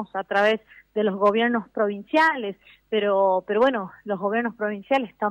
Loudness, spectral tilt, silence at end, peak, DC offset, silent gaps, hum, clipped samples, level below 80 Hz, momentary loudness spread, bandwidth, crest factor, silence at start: -23 LUFS; -6 dB/octave; 0 s; -8 dBFS; under 0.1%; none; none; under 0.1%; -66 dBFS; 10 LU; 9.8 kHz; 14 dB; 0 s